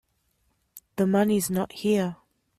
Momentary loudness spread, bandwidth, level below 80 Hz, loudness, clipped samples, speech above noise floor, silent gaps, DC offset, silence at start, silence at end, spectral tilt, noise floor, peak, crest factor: 9 LU; 15 kHz; -62 dBFS; -25 LUFS; under 0.1%; 47 dB; none; under 0.1%; 0.75 s; 0.45 s; -5.5 dB/octave; -71 dBFS; -10 dBFS; 16 dB